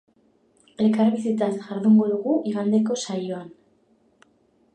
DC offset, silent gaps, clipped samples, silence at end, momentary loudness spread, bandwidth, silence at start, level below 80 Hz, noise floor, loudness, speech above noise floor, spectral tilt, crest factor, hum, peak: under 0.1%; none; under 0.1%; 1.25 s; 10 LU; 9 kHz; 0.8 s; -74 dBFS; -63 dBFS; -22 LUFS; 41 dB; -6.5 dB/octave; 14 dB; none; -8 dBFS